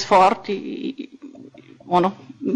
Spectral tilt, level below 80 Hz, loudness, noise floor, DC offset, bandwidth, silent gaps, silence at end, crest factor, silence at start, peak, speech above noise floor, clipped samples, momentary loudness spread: -5.5 dB/octave; -58 dBFS; -21 LUFS; -44 dBFS; under 0.1%; 10 kHz; none; 0 s; 16 dB; 0 s; -6 dBFS; 25 dB; under 0.1%; 23 LU